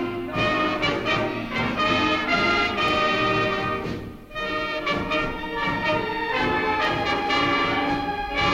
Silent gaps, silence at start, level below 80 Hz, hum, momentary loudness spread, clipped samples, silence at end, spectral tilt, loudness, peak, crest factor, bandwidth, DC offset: none; 0 s; -44 dBFS; none; 7 LU; under 0.1%; 0 s; -5 dB/octave; -23 LUFS; -8 dBFS; 14 dB; 16 kHz; under 0.1%